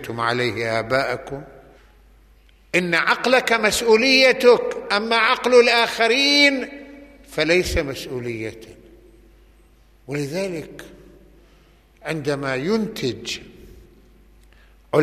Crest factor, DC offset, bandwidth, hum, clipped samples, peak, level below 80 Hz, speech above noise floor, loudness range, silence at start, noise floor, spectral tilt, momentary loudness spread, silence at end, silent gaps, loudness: 18 dB; under 0.1%; 15 kHz; none; under 0.1%; -2 dBFS; -46 dBFS; 34 dB; 16 LU; 0 s; -53 dBFS; -3.5 dB/octave; 17 LU; 0 s; none; -18 LUFS